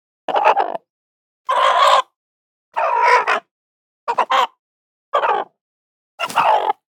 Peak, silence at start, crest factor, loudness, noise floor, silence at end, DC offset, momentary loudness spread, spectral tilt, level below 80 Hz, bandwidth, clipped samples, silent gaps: 0 dBFS; 0.3 s; 18 dB; -17 LUFS; under -90 dBFS; 0.25 s; under 0.1%; 15 LU; -1 dB/octave; -90 dBFS; 19.5 kHz; under 0.1%; 0.90-1.45 s, 2.16-2.72 s, 3.51-4.07 s, 4.59-5.12 s, 5.61-6.18 s